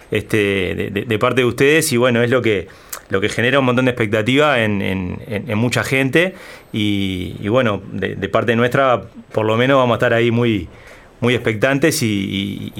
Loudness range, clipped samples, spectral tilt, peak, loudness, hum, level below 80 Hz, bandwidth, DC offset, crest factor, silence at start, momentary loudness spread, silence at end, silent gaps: 3 LU; under 0.1%; -5 dB/octave; -2 dBFS; -17 LUFS; none; -48 dBFS; 17 kHz; under 0.1%; 14 dB; 0.1 s; 9 LU; 0 s; none